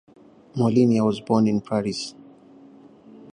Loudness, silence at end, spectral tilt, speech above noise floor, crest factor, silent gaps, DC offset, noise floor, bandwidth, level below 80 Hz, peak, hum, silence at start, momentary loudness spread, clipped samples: -22 LUFS; 1.25 s; -7 dB/octave; 28 dB; 18 dB; none; under 0.1%; -49 dBFS; 10.5 kHz; -62 dBFS; -6 dBFS; none; 0.55 s; 14 LU; under 0.1%